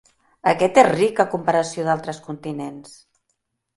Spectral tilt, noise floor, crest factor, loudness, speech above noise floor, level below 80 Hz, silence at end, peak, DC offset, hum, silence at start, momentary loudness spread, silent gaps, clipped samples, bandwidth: -5 dB/octave; -74 dBFS; 22 dB; -19 LUFS; 54 dB; -64 dBFS; 0.95 s; 0 dBFS; under 0.1%; none; 0.45 s; 16 LU; none; under 0.1%; 11.5 kHz